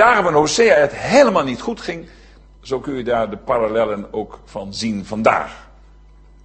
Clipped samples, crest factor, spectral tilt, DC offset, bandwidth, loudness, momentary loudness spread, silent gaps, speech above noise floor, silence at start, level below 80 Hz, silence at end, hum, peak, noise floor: under 0.1%; 18 dB; -4 dB/octave; under 0.1%; 8.8 kHz; -17 LUFS; 16 LU; none; 28 dB; 0 s; -44 dBFS; 0.8 s; none; 0 dBFS; -45 dBFS